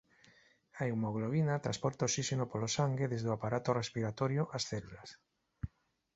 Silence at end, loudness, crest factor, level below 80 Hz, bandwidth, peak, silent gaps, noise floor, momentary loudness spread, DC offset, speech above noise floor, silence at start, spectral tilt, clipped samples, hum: 0.5 s; -36 LUFS; 20 dB; -62 dBFS; 8 kHz; -16 dBFS; none; -66 dBFS; 14 LU; under 0.1%; 31 dB; 0.75 s; -6 dB/octave; under 0.1%; none